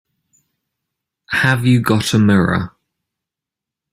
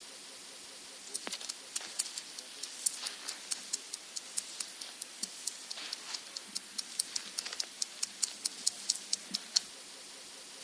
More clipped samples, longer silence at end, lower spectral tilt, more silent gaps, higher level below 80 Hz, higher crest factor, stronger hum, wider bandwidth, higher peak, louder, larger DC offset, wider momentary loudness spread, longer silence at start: neither; first, 1.25 s vs 0 s; first, -6 dB/octave vs 2 dB/octave; neither; first, -50 dBFS vs -88 dBFS; second, 16 dB vs 34 dB; neither; first, 16 kHz vs 11 kHz; first, -2 dBFS vs -6 dBFS; first, -15 LUFS vs -37 LUFS; neither; second, 8 LU vs 13 LU; first, 1.3 s vs 0 s